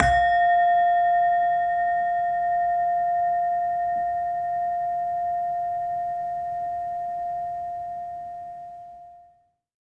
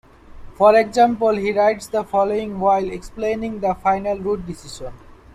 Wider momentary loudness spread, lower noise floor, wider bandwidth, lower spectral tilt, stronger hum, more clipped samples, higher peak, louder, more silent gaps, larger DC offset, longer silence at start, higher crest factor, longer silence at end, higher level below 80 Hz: about the same, 15 LU vs 16 LU; first, -61 dBFS vs -38 dBFS; second, 8.4 kHz vs 13 kHz; about the same, -5 dB/octave vs -5.5 dB/octave; neither; neither; about the same, -2 dBFS vs -2 dBFS; second, -24 LUFS vs -19 LUFS; neither; neither; second, 0 s vs 0.3 s; first, 24 dB vs 16 dB; first, 0.7 s vs 0.25 s; about the same, -48 dBFS vs -44 dBFS